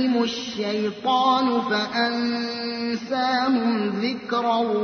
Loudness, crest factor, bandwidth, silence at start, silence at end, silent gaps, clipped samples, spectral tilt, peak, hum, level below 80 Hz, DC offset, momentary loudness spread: -23 LUFS; 14 dB; 6.6 kHz; 0 s; 0 s; none; under 0.1%; -4.5 dB/octave; -8 dBFS; none; -66 dBFS; under 0.1%; 7 LU